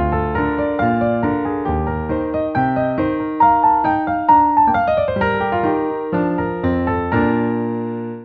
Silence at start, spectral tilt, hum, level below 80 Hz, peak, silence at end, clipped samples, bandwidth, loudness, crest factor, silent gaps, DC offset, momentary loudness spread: 0 s; -10 dB/octave; none; -36 dBFS; -2 dBFS; 0 s; under 0.1%; 5 kHz; -18 LUFS; 16 dB; none; under 0.1%; 8 LU